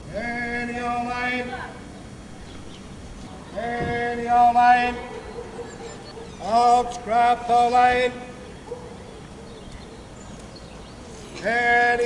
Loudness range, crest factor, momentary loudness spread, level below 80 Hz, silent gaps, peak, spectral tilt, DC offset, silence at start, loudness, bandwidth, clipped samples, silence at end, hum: 9 LU; 18 dB; 23 LU; -46 dBFS; none; -6 dBFS; -4.5 dB/octave; under 0.1%; 0 s; -21 LUFS; 11 kHz; under 0.1%; 0 s; none